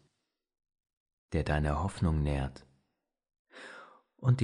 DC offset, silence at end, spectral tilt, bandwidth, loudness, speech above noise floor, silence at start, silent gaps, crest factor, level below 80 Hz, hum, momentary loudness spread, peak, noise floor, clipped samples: under 0.1%; 0 s; -7.5 dB/octave; 10.5 kHz; -33 LUFS; 52 dB; 1.3 s; 3.39-3.45 s; 18 dB; -42 dBFS; none; 18 LU; -16 dBFS; -83 dBFS; under 0.1%